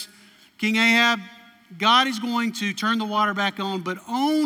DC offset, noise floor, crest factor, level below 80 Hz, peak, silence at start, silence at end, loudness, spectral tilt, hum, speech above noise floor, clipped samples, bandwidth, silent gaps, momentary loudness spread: under 0.1%; -52 dBFS; 16 dB; -78 dBFS; -6 dBFS; 0 s; 0 s; -21 LUFS; -3.5 dB/octave; none; 30 dB; under 0.1%; 17 kHz; none; 11 LU